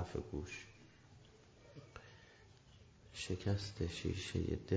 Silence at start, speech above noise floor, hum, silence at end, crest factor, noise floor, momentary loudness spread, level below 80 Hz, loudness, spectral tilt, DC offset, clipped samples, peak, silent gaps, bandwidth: 0 s; 22 dB; none; 0 s; 20 dB; -63 dBFS; 23 LU; -54 dBFS; -43 LUFS; -5.5 dB/octave; under 0.1%; under 0.1%; -24 dBFS; none; 8 kHz